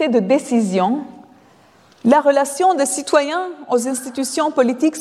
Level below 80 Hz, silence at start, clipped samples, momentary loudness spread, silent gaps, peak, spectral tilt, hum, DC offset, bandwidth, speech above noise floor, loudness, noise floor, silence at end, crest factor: -68 dBFS; 0 s; under 0.1%; 8 LU; none; -2 dBFS; -4 dB/octave; none; under 0.1%; 14.5 kHz; 33 dB; -17 LUFS; -50 dBFS; 0 s; 16 dB